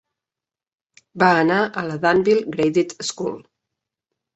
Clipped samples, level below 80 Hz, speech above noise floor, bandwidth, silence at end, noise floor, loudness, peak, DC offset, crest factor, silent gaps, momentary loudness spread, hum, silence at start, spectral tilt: under 0.1%; -62 dBFS; 71 dB; 8.2 kHz; 0.95 s; -90 dBFS; -19 LUFS; -2 dBFS; under 0.1%; 20 dB; none; 11 LU; none; 1.15 s; -5 dB/octave